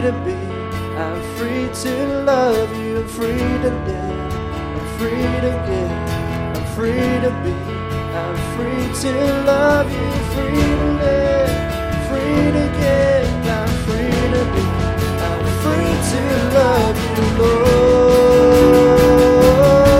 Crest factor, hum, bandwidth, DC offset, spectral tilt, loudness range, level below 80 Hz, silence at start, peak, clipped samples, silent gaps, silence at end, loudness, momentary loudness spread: 16 dB; none; 16.5 kHz; under 0.1%; -6.5 dB/octave; 8 LU; -28 dBFS; 0 s; 0 dBFS; under 0.1%; none; 0 s; -16 LUFS; 13 LU